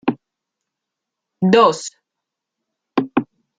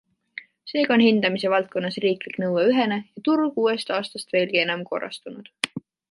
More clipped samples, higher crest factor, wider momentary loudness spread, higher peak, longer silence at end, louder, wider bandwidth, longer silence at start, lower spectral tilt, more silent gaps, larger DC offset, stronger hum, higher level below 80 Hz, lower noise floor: neither; about the same, 20 dB vs 22 dB; about the same, 18 LU vs 19 LU; about the same, -2 dBFS vs -2 dBFS; about the same, 0.35 s vs 0.3 s; first, -17 LUFS vs -23 LUFS; second, 9.4 kHz vs 11.5 kHz; second, 0.05 s vs 0.35 s; about the same, -5.5 dB/octave vs -5 dB/octave; neither; neither; neither; first, -62 dBFS vs -72 dBFS; first, -82 dBFS vs -43 dBFS